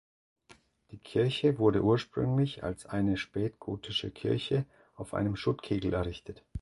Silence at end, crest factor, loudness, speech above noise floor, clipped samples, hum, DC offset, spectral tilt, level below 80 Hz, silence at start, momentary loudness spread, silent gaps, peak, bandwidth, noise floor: 0 s; 20 dB; -31 LUFS; 31 dB; under 0.1%; none; under 0.1%; -7 dB/octave; -52 dBFS; 0.9 s; 13 LU; none; -12 dBFS; 11.5 kHz; -61 dBFS